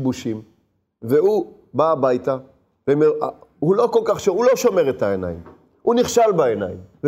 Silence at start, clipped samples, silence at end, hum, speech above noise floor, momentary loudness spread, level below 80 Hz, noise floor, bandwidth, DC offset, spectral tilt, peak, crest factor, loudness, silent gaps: 0 s; under 0.1%; 0 s; none; 45 dB; 12 LU; -56 dBFS; -64 dBFS; 16 kHz; under 0.1%; -5.5 dB/octave; -4 dBFS; 16 dB; -19 LUFS; none